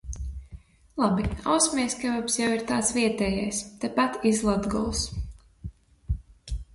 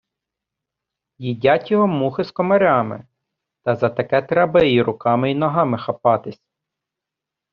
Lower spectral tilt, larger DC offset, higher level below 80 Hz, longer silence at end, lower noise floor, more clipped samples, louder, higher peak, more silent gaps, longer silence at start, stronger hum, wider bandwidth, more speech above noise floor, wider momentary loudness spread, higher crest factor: about the same, -4 dB/octave vs -5 dB/octave; neither; first, -40 dBFS vs -56 dBFS; second, 0.1 s vs 1.2 s; second, -48 dBFS vs -85 dBFS; neither; second, -26 LUFS vs -18 LUFS; second, -8 dBFS vs -2 dBFS; neither; second, 0.05 s vs 1.2 s; neither; first, 11.5 kHz vs 6.2 kHz; second, 22 dB vs 67 dB; first, 16 LU vs 12 LU; about the same, 18 dB vs 18 dB